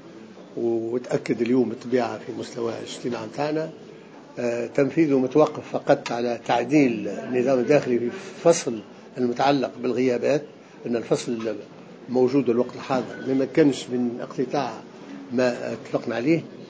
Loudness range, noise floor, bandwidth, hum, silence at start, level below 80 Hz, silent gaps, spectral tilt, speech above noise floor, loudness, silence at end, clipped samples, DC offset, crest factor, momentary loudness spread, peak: 4 LU; -44 dBFS; 8 kHz; none; 0.05 s; -70 dBFS; none; -6 dB/octave; 21 dB; -24 LUFS; 0 s; under 0.1%; under 0.1%; 20 dB; 14 LU; -4 dBFS